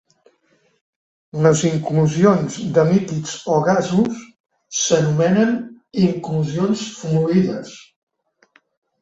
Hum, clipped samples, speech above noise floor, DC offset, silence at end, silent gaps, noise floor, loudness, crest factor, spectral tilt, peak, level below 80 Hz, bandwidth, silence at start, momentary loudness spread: none; under 0.1%; 44 dB; under 0.1%; 1.2 s; 4.40-4.44 s; -61 dBFS; -18 LUFS; 18 dB; -6 dB/octave; -2 dBFS; -56 dBFS; 8.2 kHz; 1.35 s; 10 LU